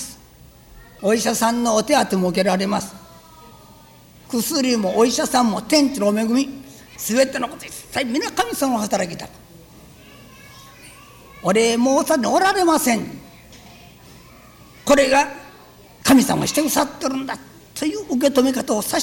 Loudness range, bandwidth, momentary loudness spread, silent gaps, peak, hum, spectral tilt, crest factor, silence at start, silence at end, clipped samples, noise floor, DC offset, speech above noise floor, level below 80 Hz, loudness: 5 LU; 19.5 kHz; 13 LU; none; -2 dBFS; none; -3.5 dB/octave; 18 dB; 0 s; 0 s; under 0.1%; -46 dBFS; under 0.1%; 28 dB; -52 dBFS; -19 LUFS